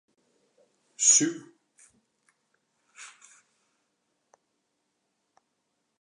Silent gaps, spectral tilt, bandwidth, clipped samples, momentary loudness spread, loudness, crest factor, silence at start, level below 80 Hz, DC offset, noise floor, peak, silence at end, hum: none; -1 dB/octave; 11 kHz; under 0.1%; 28 LU; -21 LUFS; 26 dB; 1 s; under -90 dBFS; under 0.1%; -78 dBFS; -8 dBFS; 2.95 s; none